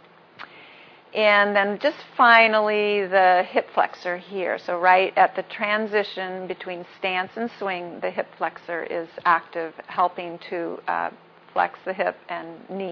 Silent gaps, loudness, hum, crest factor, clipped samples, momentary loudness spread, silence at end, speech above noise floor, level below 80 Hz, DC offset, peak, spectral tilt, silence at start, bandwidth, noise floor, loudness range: none; -22 LUFS; none; 22 dB; under 0.1%; 15 LU; 0 s; 26 dB; -78 dBFS; under 0.1%; -2 dBFS; -5.5 dB/octave; 0.4 s; 5.4 kHz; -48 dBFS; 9 LU